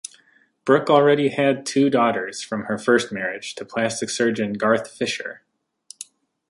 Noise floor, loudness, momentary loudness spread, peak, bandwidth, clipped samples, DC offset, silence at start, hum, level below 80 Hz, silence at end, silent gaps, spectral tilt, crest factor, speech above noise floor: -59 dBFS; -21 LUFS; 17 LU; -2 dBFS; 11.5 kHz; under 0.1%; under 0.1%; 0.65 s; none; -66 dBFS; 0.45 s; none; -4.5 dB/octave; 20 dB; 39 dB